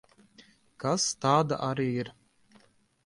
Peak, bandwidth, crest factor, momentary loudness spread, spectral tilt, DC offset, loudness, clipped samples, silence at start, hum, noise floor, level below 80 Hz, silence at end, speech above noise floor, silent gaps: -10 dBFS; 11.5 kHz; 22 dB; 10 LU; -4.5 dB/octave; under 0.1%; -28 LUFS; under 0.1%; 0.4 s; none; -63 dBFS; -68 dBFS; 0.95 s; 35 dB; none